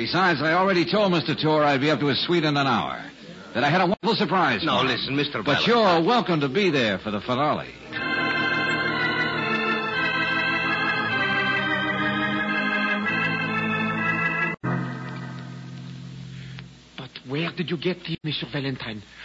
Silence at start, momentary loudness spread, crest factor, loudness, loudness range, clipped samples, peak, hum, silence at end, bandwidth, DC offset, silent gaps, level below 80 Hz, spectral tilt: 0 s; 16 LU; 14 dB; -23 LUFS; 9 LU; under 0.1%; -10 dBFS; none; 0 s; 8 kHz; under 0.1%; none; -58 dBFS; -6 dB/octave